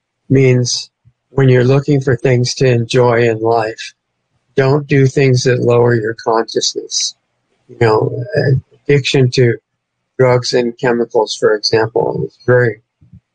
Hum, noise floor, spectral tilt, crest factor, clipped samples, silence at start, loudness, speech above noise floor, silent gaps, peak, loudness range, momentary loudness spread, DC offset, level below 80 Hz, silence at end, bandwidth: none; -71 dBFS; -5.5 dB/octave; 12 dB; under 0.1%; 0.3 s; -13 LUFS; 59 dB; none; 0 dBFS; 2 LU; 8 LU; under 0.1%; -50 dBFS; 0.6 s; 9.2 kHz